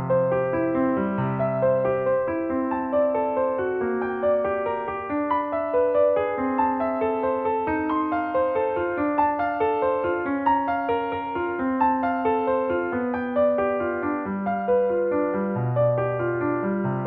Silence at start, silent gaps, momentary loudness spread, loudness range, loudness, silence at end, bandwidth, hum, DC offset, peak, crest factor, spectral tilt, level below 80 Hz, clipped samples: 0 s; none; 4 LU; 1 LU; -24 LUFS; 0 s; 4.5 kHz; none; under 0.1%; -10 dBFS; 14 dB; -10.5 dB/octave; -54 dBFS; under 0.1%